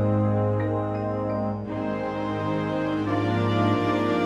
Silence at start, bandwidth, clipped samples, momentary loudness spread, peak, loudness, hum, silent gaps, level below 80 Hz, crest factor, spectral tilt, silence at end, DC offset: 0 s; 7.4 kHz; under 0.1%; 6 LU; -12 dBFS; -25 LUFS; none; none; -52 dBFS; 12 dB; -8.5 dB/octave; 0 s; under 0.1%